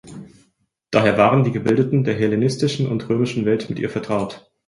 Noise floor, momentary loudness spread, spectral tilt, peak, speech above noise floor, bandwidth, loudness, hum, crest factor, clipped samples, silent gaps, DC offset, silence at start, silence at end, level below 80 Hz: -65 dBFS; 9 LU; -7 dB/octave; -2 dBFS; 46 dB; 11.5 kHz; -19 LUFS; none; 18 dB; under 0.1%; none; under 0.1%; 0.05 s; 0.3 s; -54 dBFS